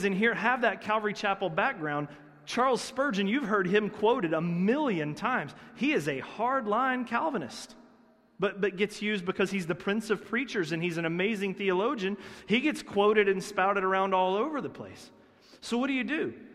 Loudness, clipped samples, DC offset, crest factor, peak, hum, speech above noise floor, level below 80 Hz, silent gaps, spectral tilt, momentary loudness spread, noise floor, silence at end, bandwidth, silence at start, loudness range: -29 LUFS; under 0.1%; under 0.1%; 18 dB; -10 dBFS; none; 32 dB; -68 dBFS; none; -5.5 dB/octave; 8 LU; -61 dBFS; 0 s; 13.5 kHz; 0 s; 3 LU